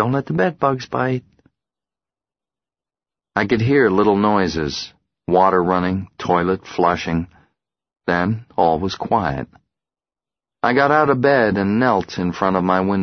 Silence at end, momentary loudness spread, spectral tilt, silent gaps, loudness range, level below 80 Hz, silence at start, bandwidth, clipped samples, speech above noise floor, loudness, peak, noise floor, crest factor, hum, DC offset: 0 s; 10 LU; -7 dB/octave; none; 5 LU; -48 dBFS; 0 s; 6.6 kHz; under 0.1%; over 72 dB; -18 LUFS; 0 dBFS; under -90 dBFS; 18 dB; none; under 0.1%